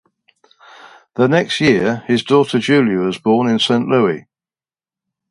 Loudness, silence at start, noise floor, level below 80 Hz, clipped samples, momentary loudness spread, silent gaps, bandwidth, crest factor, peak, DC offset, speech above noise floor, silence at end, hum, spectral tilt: -15 LUFS; 0.85 s; under -90 dBFS; -56 dBFS; under 0.1%; 4 LU; none; 11.5 kHz; 16 dB; 0 dBFS; under 0.1%; over 76 dB; 1.1 s; none; -5.5 dB/octave